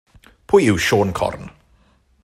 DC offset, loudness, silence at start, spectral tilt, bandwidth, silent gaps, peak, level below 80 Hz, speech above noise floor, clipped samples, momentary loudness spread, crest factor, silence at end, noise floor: under 0.1%; -17 LUFS; 0.5 s; -5 dB/octave; 14.5 kHz; none; -2 dBFS; -46 dBFS; 40 dB; under 0.1%; 10 LU; 18 dB; 0.75 s; -57 dBFS